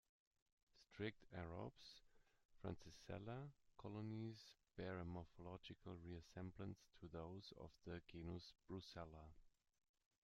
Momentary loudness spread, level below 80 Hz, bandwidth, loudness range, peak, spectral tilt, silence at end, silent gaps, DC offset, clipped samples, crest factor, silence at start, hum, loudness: 9 LU; -74 dBFS; 12 kHz; 2 LU; -34 dBFS; -6.5 dB/octave; 0.75 s; 2.45-2.49 s; under 0.1%; under 0.1%; 22 dB; 0.75 s; none; -56 LUFS